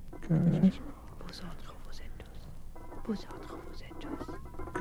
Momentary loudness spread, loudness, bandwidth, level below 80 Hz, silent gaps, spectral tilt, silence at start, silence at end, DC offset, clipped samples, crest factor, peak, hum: 21 LU; -33 LUFS; 13 kHz; -44 dBFS; none; -8 dB/octave; 0 s; 0 s; under 0.1%; under 0.1%; 20 dB; -14 dBFS; none